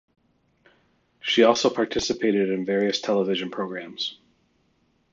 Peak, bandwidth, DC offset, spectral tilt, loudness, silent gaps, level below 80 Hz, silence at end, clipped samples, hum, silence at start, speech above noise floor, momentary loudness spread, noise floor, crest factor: -4 dBFS; 7.8 kHz; under 0.1%; -4 dB/octave; -24 LUFS; none; -60 dBFS; 1 s; under 0.1%; none; 1.25 s; 44 dB; 12 LU; -67 dBFS; 22 dB